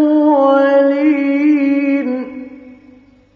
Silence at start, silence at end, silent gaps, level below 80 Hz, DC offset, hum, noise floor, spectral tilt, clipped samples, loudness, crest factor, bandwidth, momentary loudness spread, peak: 0 s; 0.65 s; none; -62 dBFS; under 0.1%; none; -45 dBFS; -6.5 dB/octave; under 0.1%; -13 LUFS; 12 dB; 5 kHz; 15 LU; -2 dBFS